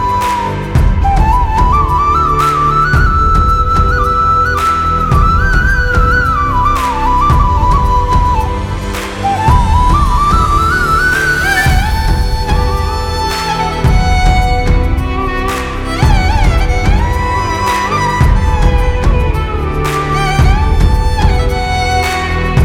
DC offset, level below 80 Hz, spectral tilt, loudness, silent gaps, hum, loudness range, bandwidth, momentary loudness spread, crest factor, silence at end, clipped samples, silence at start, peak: under 0.1%; -14 dBFS; -5.5 dB/octave; -12 LUFS; none; none; 3 LU; 16 kHz; 5 LU; 10 dB; 0 s; under 0.1%; 0 s; 0 dBFS